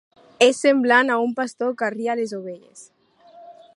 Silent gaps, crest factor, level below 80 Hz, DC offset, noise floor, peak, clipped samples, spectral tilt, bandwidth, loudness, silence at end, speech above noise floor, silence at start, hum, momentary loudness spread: none; 20 dB; -78 dBFS; under 0.1%; -49 dBFS; -2 dBFS; under 0.1%; -3 dB/octave; 11.5 kHz; -20 LUFS; 0.25 s; 28 dB; 0.4 s; none; 16 LU